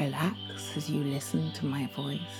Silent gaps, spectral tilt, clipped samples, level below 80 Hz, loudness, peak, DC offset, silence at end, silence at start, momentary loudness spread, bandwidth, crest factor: none; -5.5 dB/octave; under 0.1%; -74 dBFS; -33 LUFS; -16 dBFS; under 0.1%; 0 s; 0 s; 4 LU; 18 kHz; 16 dB